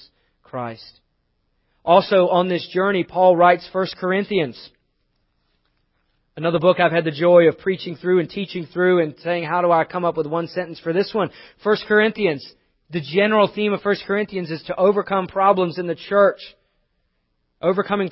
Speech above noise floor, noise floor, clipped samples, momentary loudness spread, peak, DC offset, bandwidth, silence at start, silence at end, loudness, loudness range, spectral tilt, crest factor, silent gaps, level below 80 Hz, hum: 51 dB; -70 dBFS; under 0.1%; 13 LU; 0 dBFS; under 0.1%; 5.8 kHz; 0.55 s; 0 s; -19 LUFS; 4 LU; -10.5 dB/octave; 20 dB; none; -62 dBFS; none